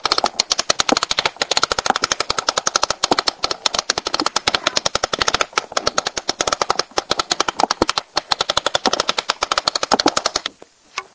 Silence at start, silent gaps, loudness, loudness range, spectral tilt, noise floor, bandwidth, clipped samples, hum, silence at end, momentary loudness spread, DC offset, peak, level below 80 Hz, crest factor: 0.05 s; none; -18 LUFS; 2 LU; -1 dB/octave; -46 dBFS; 8 kHz; under 0.1%; none; 0.15 s; 4 LU; under 0.1%; 0 dBFS; -48 dBFS; 20 dB